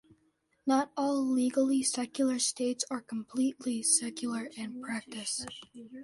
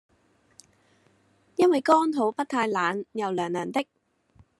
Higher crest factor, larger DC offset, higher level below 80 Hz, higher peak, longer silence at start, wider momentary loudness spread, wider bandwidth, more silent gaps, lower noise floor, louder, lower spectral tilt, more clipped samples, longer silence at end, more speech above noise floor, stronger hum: about the same, 18 dB vs 20 dB; neither; about the same, -74 dBFS vs -74 dBFS; second, -14 dBFS vs -6 dBFS; second, 0.65 s vs 1.6 s; about the same, 11 LU vs 10 LU; about the same, 11.5 kHz vs 12 kHz; neither; first, -73 dBFS vs -65 dBFS; second, -31 LUFS vs -25 LUFS; second, -2 dB/octave vs -5 dB/octave; neither; second, 0 s vs 0.75 s; about the same, 42 dB vs 40 dB; neither